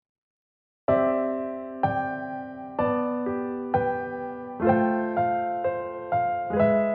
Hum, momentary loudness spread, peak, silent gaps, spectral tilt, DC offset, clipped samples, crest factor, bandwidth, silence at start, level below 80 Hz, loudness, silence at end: none; 11 LU; -8 dBFS; none; -7 dB/octave; under 0.1%; under 0.1%; 18 dB; 4.3 kHz; 0.9 s; -58 dBFS; -27 LUFS; 0 s